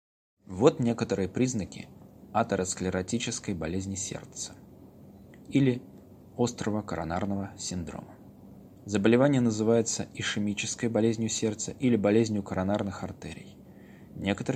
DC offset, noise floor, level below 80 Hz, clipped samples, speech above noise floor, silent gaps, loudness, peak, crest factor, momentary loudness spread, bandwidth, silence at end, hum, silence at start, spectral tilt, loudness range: under 0.1%; -51 dBFS; -58 dBFS; under 0.1%; 23 dB; none; -29 LUFS; -4 dBFS; 24 dB; 16 LU; 15.5 kHz; 0 s; none; 0.5 s; -5 dB/octave; 6 LU